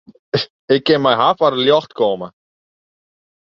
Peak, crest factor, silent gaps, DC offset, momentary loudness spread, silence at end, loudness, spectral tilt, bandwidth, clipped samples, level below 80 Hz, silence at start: -2 dBFS; 16 dB; 0.50-0.68 s; under 0.1%; 9 LU; 1.15 s; -16 LUFS; -6.5 dB/octave; 7.2 kHz; under 0.1%; -60 dBFS; 0.35 s